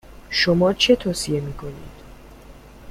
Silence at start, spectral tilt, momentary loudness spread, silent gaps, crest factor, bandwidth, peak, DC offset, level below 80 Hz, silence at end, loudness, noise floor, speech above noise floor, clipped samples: 0.1 s; -4.5 dB/octave; 19 LU; none; 18 dB; 15.5 kHz; -4 dBFS; under 0.1%; -44 dBFS; 0 s; -19 LUFS; -43 dBFS; 23 dB; under 0.1%